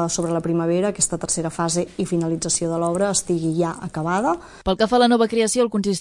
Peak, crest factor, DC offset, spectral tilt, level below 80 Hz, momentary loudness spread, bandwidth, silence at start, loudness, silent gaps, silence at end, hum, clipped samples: -4 dBFS; 18 dB; under 0.1%; -4.5 dB/octave; -48 dBFS; 7 LU; 11.5 kHz; 0 s; -21 LUFS; none; 0 s; none; under 0.1%